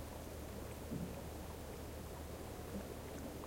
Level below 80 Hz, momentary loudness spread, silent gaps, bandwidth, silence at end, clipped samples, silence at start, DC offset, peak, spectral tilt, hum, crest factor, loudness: -56 dBFS; 3 LU; none; 16.5 kHz; 0 s; under 0.1%; 0 s; under 0.1%; -32 dBFS; -5.5 dB/octave; none; 16 dB; -48 LUFS